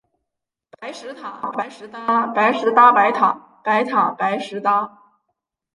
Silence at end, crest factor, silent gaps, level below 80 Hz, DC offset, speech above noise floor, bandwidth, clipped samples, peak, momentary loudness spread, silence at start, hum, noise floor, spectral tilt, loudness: 0.85 s; 18 dB; none; -74 dBFS; under 0.1%; 63 dB; 11.5 kHz; under 0.1%; -2 dBFS; 20 LU; 0.8 s; none; -82 dBFS; -5 dB/octave; -18 LUFS